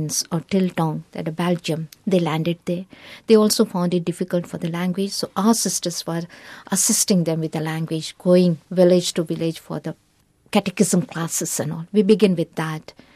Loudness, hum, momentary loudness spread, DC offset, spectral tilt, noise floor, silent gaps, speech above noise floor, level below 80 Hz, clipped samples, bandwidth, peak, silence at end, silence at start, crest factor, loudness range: -21 LUFS; none; 12 LU; under 0.1%; -5 dB/octave; -59 dBFS; none; 39 dB; -62 dBFS; under 0.1%; 15 kHz; -2 dBFS; 0.35 s; 0 s; 18 dB; 3 LU